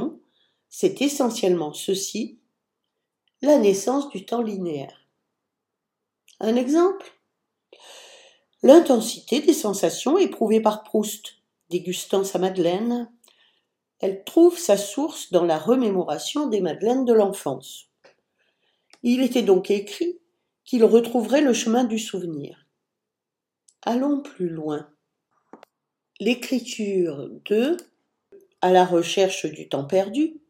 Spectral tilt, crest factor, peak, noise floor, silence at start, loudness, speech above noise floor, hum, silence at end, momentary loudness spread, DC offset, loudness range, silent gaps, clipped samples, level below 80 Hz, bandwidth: -4.5 dB/octave; 22 dB; 0 dBFS; -86 dBFS; 0 s; -22 LUFS; 65 dB; none; 0.1 s; 13 LU; under 0.1%; 7 LU; none; under 0.1%; -78 dBFS; 17 kHz